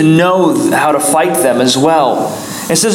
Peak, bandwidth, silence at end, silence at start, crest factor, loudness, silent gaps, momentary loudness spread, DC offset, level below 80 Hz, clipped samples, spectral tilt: 0 dBFS; 17.5 kHz; 0 s; 0 s; 10 dB; -11 LUFS; none; 6 LU; under 0.1%; -54 dBFS; under 0.1%; -4 dB/octave